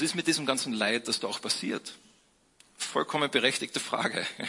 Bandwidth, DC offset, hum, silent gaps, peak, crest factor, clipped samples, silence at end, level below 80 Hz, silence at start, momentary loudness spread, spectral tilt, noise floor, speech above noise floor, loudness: 11.5 kHz; under 0.1%; none; none; -8 dBFS; 22 dB; under 0.1%; 0 s; -74 dBFS; 0 s; 8 LU; -2.5 dB/octave; -65 dBFS; 35 dB; -29 LUFS